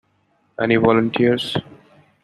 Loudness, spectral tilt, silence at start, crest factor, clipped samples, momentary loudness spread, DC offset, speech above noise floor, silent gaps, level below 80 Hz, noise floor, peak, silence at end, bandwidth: -18 LUFS; -7 dB/octave; 0.6 s; 18 dB; under 0.1%; 11 LU; under 0.1%; 46 dB; none; -56 dBFS; -63 dBFS; -2 dBFS; 0.5 s; 12 kHz